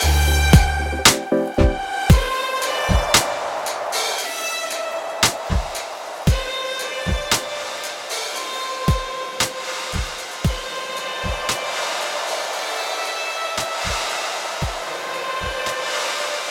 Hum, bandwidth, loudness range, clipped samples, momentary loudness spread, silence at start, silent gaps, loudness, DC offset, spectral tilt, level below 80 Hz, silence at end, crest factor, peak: none; 18 kHz; 6 LU; under 0.1%; 10 LU; 0 s; none; -21 LUFS; under 0.1%; -3.5 dB/octave; -28 dBFS; 0 s; 20 dB; 0 dBFS